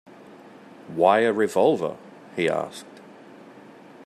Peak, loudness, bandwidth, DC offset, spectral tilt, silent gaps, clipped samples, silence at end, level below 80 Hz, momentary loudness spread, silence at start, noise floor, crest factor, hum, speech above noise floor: -4 dBFS; -22 LUFS; 14 kHz; under 0.1%; -5.5 dB/octave; none; under 0.1%; 0.45 s; -72 dBFS; 21 LU; 0.3 s; -47 dBFS; 22 dB; none; 25 dB